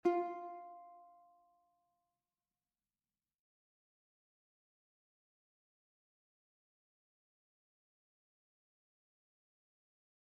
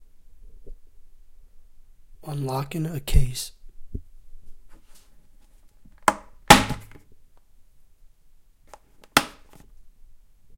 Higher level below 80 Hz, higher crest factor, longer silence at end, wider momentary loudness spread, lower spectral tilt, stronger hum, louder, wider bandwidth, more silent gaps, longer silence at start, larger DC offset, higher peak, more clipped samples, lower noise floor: second, under -90 dBFS vs -34 dBFS; about the same, 28 dB vs 28 dB; first, 9.25 s vs 0.4 s; second, 22 LU vs 26 LU; about the same, -4.5 dB/octave vs -3.5 dB/octave; neither; second, -42 LUFS vs -22 LUFS; second, 6.2 kHz vs 16.5 kHz; neither; second, 0.05 s vs 0.45 s; neither; second, -22 dBFS vs 0 dBFS; neither; first, under -90 dBFS vs -52 dBFS